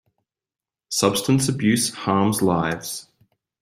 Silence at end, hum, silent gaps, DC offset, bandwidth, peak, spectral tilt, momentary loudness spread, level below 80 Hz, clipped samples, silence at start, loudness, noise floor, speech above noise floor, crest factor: 0.6 s; none; none; under 0.1%; 16 kHz; -2 dBFS; -4.5 dB/octave; 9 LU; -56 dBFS; under 0.1%; 0.9 s; -21 LUFS; under -90 dBFS; over 69 dB; 20 dB